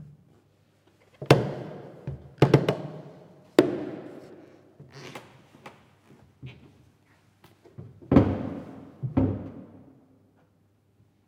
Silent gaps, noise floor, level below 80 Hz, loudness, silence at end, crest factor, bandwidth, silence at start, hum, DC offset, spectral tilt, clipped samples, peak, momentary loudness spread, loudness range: none; -65 dBFS; -52 dBFS; -25 LUFS; 1.65 s; 28 dB; 16 kHz; 0 s; none; under 0.1%; -7.5 dB/octave; under 0.1%; 0 dBFS; 26 LU; 22 LU